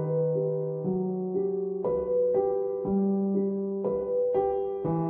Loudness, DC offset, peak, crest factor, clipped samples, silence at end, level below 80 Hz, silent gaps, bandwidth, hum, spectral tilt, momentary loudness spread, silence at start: -28 LUFS; under 0.1%; -16 dBFS; 12 dB; under 0.1%; 0 s; -58 dBFS; none; 3.3 kHz; none; -14 dB/octave; 4 LU; 0 s